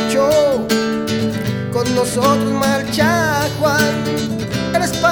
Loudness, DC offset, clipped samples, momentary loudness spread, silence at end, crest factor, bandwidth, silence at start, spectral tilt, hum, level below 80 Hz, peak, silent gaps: -16 LUFS; under 0.1%; under 0.1%; 6 LU; 0 s; 14 dB; over 20 kHz; 0 s; -4.5 dB/octave; none; -42 dBFS; -2 dBFS; none